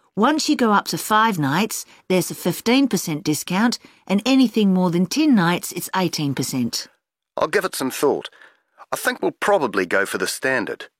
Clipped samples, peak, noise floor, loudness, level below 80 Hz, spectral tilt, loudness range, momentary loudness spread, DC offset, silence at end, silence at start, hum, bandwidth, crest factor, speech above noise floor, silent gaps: under 0.1%; -4 dBFS; -49 dBFS; -20 LUFS; -64 dBFS; -4.5 dB/octave; 4 LU; 8 LU; under 0.1%; 0.15 s; 0.15 s; none; 16.5 kHz; 16 dB; 29 dB; none